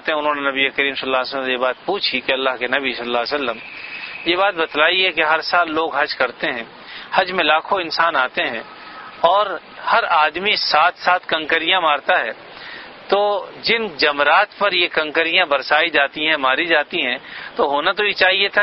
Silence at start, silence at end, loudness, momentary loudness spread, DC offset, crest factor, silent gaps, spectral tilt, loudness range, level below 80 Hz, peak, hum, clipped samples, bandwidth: 0.05 s; 0 s; -17 LUFS; 12 LU; under 0.1%; 18 dB; none; -5 dB/octave; 3 LU; -58 dBFS; 0 dBFS; none; under 0.1%; 6 kHz